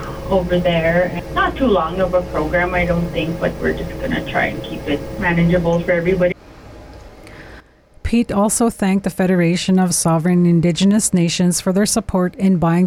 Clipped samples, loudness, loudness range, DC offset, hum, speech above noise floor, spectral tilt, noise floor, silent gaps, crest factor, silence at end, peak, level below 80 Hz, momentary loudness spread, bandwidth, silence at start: under 0.1%; -17 LUFS; 5 LU; under 0.1%; none; 27 dB; -5.5 dB/octave; -44 dBFS; none; 12 dB; 0 s; -6 dBFS; -34 dBFS; 7 LU; over 20 kHz; 0 s